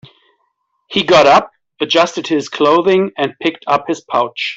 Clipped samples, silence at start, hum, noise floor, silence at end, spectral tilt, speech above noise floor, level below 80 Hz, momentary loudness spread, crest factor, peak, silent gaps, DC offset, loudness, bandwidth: under 0.1%; 0.9 s; none; -66 dBFS; 0 s; -4 dB/octave; 52 dB; -56 dBFS; 10 LU; 14 dB; -2 dBFS; none; under 0.1%; -14 LUFS; 8 kHz